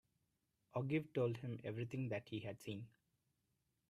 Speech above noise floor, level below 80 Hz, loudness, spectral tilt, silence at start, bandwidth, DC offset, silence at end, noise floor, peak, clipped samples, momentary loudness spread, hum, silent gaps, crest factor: 42 dB; -80 dBFS; -45 LUFS; -7.5 dB/octave; 0.75 s; 14 kHz; under 0.1%; 1 s; -86 dBFS; -28 dBFS; under 0.1%; 10 LU; none; none; 18 dB